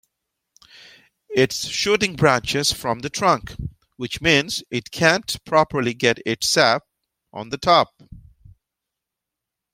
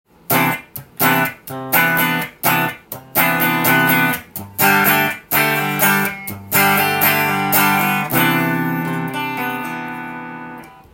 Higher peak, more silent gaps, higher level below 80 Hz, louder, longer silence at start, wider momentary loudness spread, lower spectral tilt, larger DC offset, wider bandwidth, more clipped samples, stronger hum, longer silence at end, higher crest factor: about the same, 0 dBFS vs 0 dBFS; neither; first, -50 dBFS vs -58 dBFS; second, -20 LUFS vs -16 LUFS; first, 1.3 s vs 0.3 s; about the same, 14 LU vs 15 LU; about the same, -3.5 dB/octave vs -3.5 dB/octave; neither; about the same, 16.5 kHz vs 17 kHz; neither; neither; first, 1.55 s vs 0.25 s; about the same, 22 dB vs 18 dB